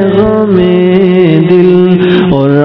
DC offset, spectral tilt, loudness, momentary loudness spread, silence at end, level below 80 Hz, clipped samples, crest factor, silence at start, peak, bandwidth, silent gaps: under 0.1%; -10.5 dB/octave; -7 LUFS; 2 LU; 0 s; -36 dBFS; 6%; 6 dB; 0 s; 0 dBFS; 5.4 kHz; none